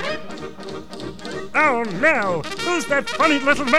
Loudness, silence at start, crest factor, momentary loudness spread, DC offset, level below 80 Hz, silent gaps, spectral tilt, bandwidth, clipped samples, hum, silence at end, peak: -19 LUFS; 0 s; 20 dB; 16 LU; 2%; -50 dBFS; none; -3.5 dB/octave; 14.5 kHz; under 0.1%; none; 0 s; 0 dBFS